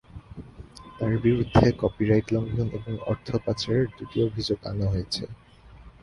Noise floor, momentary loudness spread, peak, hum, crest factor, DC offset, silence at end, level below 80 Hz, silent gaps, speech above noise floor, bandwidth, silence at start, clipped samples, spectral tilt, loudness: -49 dBFS; 23 LU; -4 dBFS; none; 22 dB; under 0.1%; 0.1 s; -44 dBFS; none; 24 dB; 11.5 kHz; 0.15 s; under 0.1%; -7 dB/octave; -26 LUFS